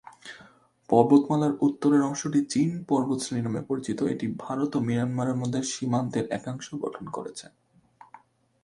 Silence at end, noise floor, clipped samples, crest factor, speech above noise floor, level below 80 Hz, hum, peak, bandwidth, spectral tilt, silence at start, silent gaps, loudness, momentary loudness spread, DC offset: 0.45 s; -56 dBFS; under 0.1%; 22 dB; 30 dB; -66 dBFS; none; -4 dBFS; 11.5 kHz; -6 dB/octave; 0.05 s; none; -26 LUFS; 14 LU; under 0.1%